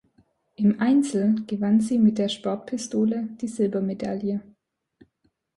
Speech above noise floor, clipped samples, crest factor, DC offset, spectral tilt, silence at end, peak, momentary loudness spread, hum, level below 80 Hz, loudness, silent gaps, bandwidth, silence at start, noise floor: 48 dB; under 0.1%; 14 dB; under 0.1%; -6.5 dB/octave; 1.15 s; -10 dBFS; 9 LU; none; -66 dBFS; -24 LUFS; none; 11.5 kHz; 0.6 s; -71 dBFS